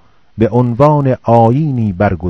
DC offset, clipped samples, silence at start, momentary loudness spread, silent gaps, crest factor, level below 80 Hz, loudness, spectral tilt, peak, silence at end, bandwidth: under 0.1%; 0.6%; 0.35 s; 5 LU; none; 12 dB; -38 dBFS; -12 LUFS; -10 dB/octave; 0 dBFS; 0 s; 6.2 kHz